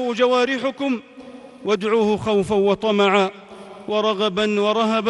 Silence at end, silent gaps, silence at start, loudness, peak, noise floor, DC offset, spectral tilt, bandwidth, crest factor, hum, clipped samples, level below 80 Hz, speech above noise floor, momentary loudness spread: 0 s; none; 0 s; -20 LUFS; -6 dBFS; -40 dBFS; under 0.1%; -5 dB/octave; 11.5 kHz; 14 dB; none; under 0.1%; -56 dBFS; 21 dB; 12 LU